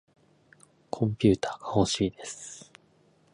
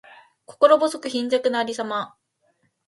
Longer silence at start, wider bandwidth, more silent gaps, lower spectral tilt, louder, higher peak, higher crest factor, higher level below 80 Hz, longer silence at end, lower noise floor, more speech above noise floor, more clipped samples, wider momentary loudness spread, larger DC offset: first, 0.95 s vs 0.6 s; about the same, 11 kHz vs 11.5 kHz; neither; first, -5.5 dB/octave vs -3.5 dB/octave; second, -28 LUFS vs -21 LUFS; second, -8 dBFS vs 0 dBFS; about the same, 22 dB vs 22 dB; first, -52 dBFS vs -76 dBFS; about the same, 0.75 s vs 0.8 s; second, -63 dBFS vs -68 dBFS; second, 36 dB vs 47 dB; neither; first, 17 LU vs 12 LU; neither